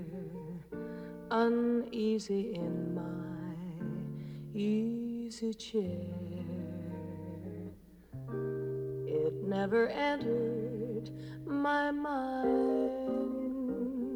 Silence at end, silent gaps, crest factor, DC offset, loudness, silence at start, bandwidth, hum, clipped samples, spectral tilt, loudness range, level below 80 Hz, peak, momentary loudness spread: 0 s; none; 16 dB; under 0.1%; -35 LUFS; 0 s; 19.5 kHz; none; under 0.1%; -7 dB/octave; 7 LU; -64 dBFS; -18 dBFS; 13 LU